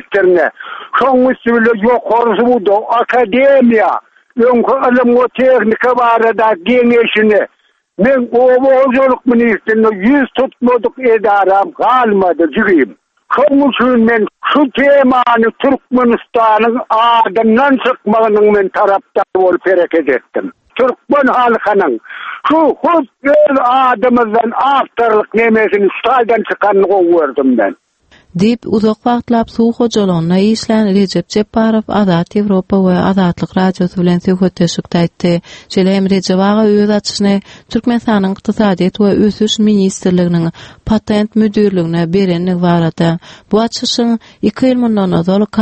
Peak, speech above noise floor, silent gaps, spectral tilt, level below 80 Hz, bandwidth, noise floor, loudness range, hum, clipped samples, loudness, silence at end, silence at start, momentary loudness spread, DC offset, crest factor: 0 dBFS; 37 dB; none; -6.5 dB/octave; -46 dBFS; 8.6 kHz; -47 dBFS; 3 LU; none; under 0.1%; -11 LUFS; 0 s; 0.1 s; 6 LU; under 0.1%; 10 dB